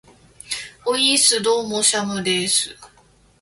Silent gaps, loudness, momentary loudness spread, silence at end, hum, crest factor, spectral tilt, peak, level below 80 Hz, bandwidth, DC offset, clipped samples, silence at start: none; -18 LUFS; 15 LU; 0.55 s; none; 20 dB; -1.5 dB/octave; -2 dBFS; -58 dBFS; 12 kHz; under 0.1%; under 0.1%; 0.45 s